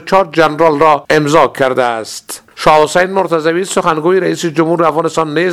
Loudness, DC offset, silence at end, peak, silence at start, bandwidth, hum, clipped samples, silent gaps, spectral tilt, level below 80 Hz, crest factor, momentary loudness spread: -11 LUFS; under 0.1%; 0 s; 0 dBFS; 0 s; 15 kHz; none; 0.4%; none; -5 dB/octave; -44 dBFS; 12 dB; 6 LU